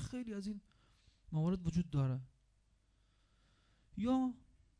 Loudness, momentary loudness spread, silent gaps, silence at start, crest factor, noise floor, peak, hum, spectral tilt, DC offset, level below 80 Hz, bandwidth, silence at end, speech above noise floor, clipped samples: -39 LUFS; 13 LU; none; 0 s; 16 dB; -74 dBFS; -24 dBFS; none; -8 dB/octave; under 0.1%; -60 dBFS; 10.5 kHz; 0.45 s; 36 dB; under 0.1%